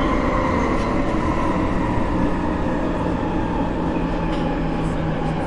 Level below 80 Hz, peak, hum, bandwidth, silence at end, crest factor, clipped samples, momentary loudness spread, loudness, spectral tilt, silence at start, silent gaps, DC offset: -28 dBFS; -6 dBFS; none; 11 kHz; 0 s; 14 dB; under 0.1%; 3 LU; -22 LUFS; -7.5 dB/octave; 0 s; none; under 0.1%